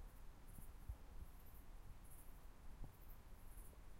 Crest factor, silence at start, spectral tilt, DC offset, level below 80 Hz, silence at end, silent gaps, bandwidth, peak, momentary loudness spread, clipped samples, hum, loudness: 16 dB; 0 s; -5 dB/octave; under 0.1%; -58 dBFS; 0 s; none; 16 kHz; -40 dBFS; 5 LU; under 0.1%; none; -62 LUFS